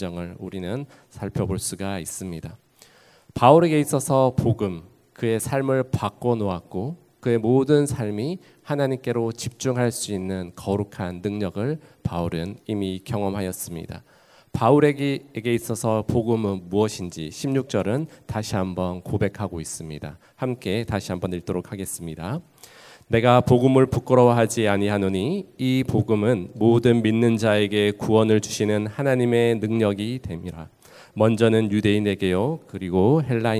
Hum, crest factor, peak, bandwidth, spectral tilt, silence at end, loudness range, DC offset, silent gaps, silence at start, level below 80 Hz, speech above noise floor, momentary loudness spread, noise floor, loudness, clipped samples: none; 22 dB; 0 dBFS; 16 kHz; -6 dB/octave; 0 s; 8 LU; under 0.1%; none; 0 s; -46 dBFS; 32 dB; 14 LU; -54 dBFS; -23 LUFS; under 0.1%